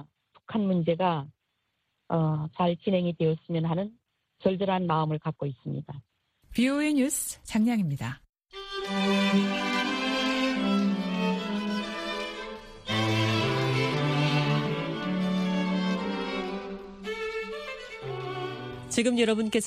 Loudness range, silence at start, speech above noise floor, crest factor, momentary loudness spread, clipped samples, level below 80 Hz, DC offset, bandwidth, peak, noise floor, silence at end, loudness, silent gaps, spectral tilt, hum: 4 LU; 0 s; 52 dB; 18 dB; 12 LU; under 0.1%; -58 dBFS; under 0.1%; 15 kHz; -10 dBFS; -78 dBFS; 0 s; -28 LUFS; 8.29-8.33 s; -5.5 dB/octave; none